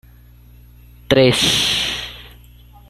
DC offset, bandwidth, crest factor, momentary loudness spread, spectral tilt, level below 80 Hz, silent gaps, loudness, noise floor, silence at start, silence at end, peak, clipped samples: under 0.1%; 15.5 kHz; 18 dB; 18 LU; -3.5 dB/octave; -42 dBFS; none; -15 LUFS; -44 dBFS; 1.1 s; 0.65 s; -2 dBFS; under 0.1%